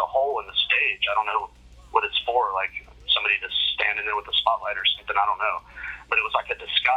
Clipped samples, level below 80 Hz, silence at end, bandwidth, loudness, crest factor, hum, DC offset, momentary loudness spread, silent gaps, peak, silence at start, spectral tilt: under 0.1%; -54 dBFS; 0 s; 12.5 kHz; -23 LUFS; 20 dB; none; under 0.1%; 8 LU; none; -4 dBFS; 0 s; -2 dB/octave